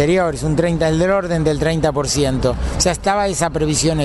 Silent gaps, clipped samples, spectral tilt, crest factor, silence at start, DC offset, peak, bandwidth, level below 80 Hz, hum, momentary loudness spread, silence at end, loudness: none; under 0.1%; -5 dB/octave; 14 dB; 0 s; under 0.1%; -2 dBFS; 12 kHz; -30 dBFS; none; 2 LU; 0 s; -17 LUFS